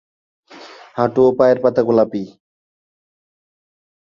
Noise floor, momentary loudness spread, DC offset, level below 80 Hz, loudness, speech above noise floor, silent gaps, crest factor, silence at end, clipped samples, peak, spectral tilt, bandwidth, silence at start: -40 dBFS; 16 LU; under 0.1%; -60 dBFS; -15 LUFS; 25 dB; none; 18 dB; 1.85 s; under 0.1%; -2 dBFS; -8 dB/octave; 7 kHz; 0.55 s